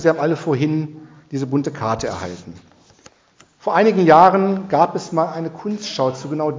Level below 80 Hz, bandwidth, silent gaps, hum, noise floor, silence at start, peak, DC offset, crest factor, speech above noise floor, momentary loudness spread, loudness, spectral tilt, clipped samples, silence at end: -54 dBFS; 7.6 kHz; none; none; -54 dBFS; 0 s; 0 dBFS; under 0.1%; 18 dB; 36 dB; 17 LU; -18 LUFS; -6.5 dB/octave; under 0.1%; 0 s